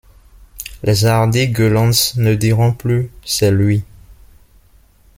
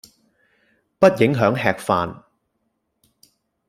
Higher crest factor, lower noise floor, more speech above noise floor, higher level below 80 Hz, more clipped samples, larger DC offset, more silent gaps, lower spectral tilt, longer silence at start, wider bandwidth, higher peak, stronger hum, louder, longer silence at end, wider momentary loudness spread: about the same, 16 dB vs 20 dB; second, -49 dBFS vs -72 dBFS; second, 35 dB vs 55 dB; first, -40 dBFS vs -58 dBFS; neither; neither; neither; second, -5 dB/octave vs -6.5 dB/octave; second, 0.55 s vs 1 s; about the same, 16.5 kHz vs 15.5 kHz; about the same, 0 dBFS vs -2 dBFS; neither; first, -15 LUFS vs -19 LUFS; second, 1.05 s vs 1.55 s; about the same, 8 LU vs 7 LU